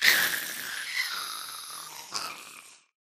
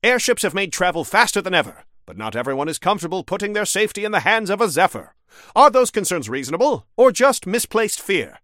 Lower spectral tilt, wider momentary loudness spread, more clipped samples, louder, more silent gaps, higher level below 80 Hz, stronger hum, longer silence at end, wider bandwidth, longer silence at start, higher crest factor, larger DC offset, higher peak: second, 1.5 dB/octave vs -3 dB/octave; first, 16 LU vs 10 LU; neither; second, -30 LUFS vs -18 LUFS; neither; second, -74 dBFS vs -56 dBFS; neither; first, 0.3 s vs 0.15 s; about the same, 15.5 kHz vs 16.5 kHz; about the same, 0 s vs 0.05 s; first, 28 dB vs 18 dB; neither; second, -4 dBFS vs 0 dBFS